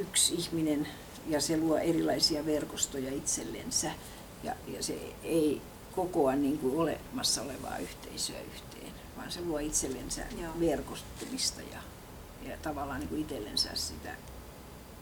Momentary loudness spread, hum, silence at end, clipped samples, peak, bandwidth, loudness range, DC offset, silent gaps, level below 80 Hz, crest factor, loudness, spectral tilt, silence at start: 17 LU; none; 0 s; under 0.1%; -12 dBFS; over 20 kHz; 5 LU; under 0.1%; none; -52 dBFS; 22 dB; -32 LUFS; -3 dB/octave; 0 s